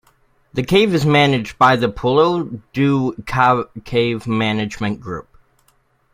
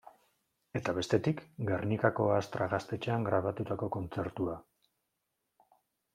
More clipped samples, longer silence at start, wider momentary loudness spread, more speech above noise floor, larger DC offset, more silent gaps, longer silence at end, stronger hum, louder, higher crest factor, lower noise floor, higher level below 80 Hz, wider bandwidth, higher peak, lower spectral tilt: neither; first, 0.55 s vs 0.05 s; first, 12 LU vs 8 LU; second, 43 dB vs 51 dB; neither; neither; second, 0.95 s vs 1.55 s; neither; first, -17 LUFS vs -33 LUFS; second, 18 dB vs 24 dB; second, -59 dBFS vs -84 dBFS; first, -46 dBFS vs -66 dBFS; first, 16 kHz vs 14 kHz; first, 0 dBFS vs -10 dBFS; about the same, -6.5 dB/octave vs -7 dB/octave